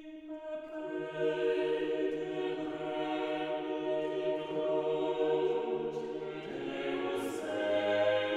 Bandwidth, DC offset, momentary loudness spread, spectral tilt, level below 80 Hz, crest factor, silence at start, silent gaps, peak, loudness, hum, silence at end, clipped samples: 13.5 kHz; under 0.1%; 9 LU; -5.5 dB/octave; -74 dBFS; 14 dB; 0 s; none; -18 dBFS; -34 LUFS; none; 0 s; under 0.1%